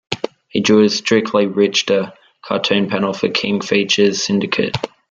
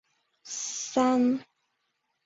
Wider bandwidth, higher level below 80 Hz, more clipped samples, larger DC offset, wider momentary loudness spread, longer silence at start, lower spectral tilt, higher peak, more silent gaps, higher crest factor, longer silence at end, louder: about the same, 7.8 kHz vs 7.8 kHz; first, -56 dBFS vs -74 dBFS; neither; neither; about the same, 10 LU vs 11 LU; second, 0.1 s vs 0.45 s; about the same, -4 dB/octave vs -3 dB/octave; first, 0 dBFS vs -12 dBFS; neither; about the same, 16 dB vs 18 dB; second, 0.25 s vs 0.85 s; first, -16 LUFS vs -27 LUFS